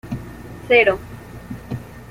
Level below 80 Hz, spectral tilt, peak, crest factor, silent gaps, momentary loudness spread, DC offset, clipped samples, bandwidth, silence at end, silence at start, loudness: -44 dBFS; -6 dB/octave; -2 dBFS; 20 dB; none; 22 LU; under 0.1%; under 0.1%; 16 kHz; 0.05 s; 0.05 s; -16 LUFS